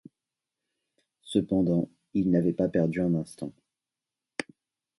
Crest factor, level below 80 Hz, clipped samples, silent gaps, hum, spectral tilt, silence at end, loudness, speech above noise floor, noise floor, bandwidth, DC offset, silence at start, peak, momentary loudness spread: 20 dB; -60 dBFS; under 0.1%; none; none; -7.5 dB/octave; 0.55 s; -28 LUFS; 64 dB; -90 dBFS; 11.5 kHz; under 0.1%; 1.25 s; -10 dBFS; 14 LU